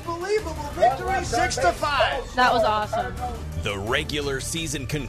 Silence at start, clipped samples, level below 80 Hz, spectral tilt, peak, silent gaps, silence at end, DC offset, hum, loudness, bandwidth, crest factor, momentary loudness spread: 0 s; under 0.1%; -38 dBFS; -4 dB/octave; -8 dBFS; none; 0 s; under 0.1%; none; -24 LUFS; 14 kHz; 16 dB; 9 LU